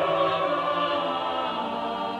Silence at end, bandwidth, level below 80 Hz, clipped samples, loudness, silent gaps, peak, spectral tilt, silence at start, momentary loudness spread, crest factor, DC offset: 0 s; 10.5 kHz; -64 dBFS; under 0.1%; -26 LUFS; none; -10 dBFS; -5.5 dB/octave; 0 s; 5 LU; 16 dB; under 0.1%